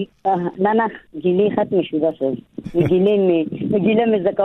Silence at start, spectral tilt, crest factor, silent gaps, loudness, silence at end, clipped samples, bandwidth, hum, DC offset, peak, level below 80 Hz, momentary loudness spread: 0 s; -9.5 dB/octave; 14 dB; none; -18 LUFS; 0 s; under 0.1%; 4.1 kHz; none; under 0.1%; -4 dBFS; -52 dBFS; 9 LU